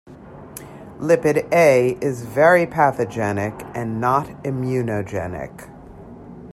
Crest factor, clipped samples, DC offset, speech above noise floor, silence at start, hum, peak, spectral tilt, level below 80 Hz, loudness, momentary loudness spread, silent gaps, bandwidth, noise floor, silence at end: 18 dB; under 0.1%; under 0.1%; 21 dB; 0.05 s; none; -2 dBFS; -6.5 dB/octave; -52 dBFS; -19 LUFS; 23 LU; none; 15.5 kHz; -39 dBFS; 0 s